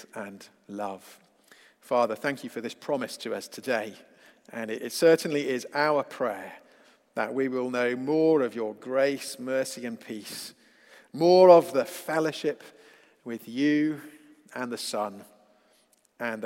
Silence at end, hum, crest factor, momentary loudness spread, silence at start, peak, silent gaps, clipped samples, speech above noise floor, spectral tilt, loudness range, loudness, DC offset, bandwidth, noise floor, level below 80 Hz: 0 s; none; 24 dB; 18 LU; 0 s; -4 dBFS; none; under 0.1%; 39 dB; -5 dB/octave; 8 LU; -26 LUFS; under 0.1%; 16.5 kHz; -65 dBFS; -84 dBFS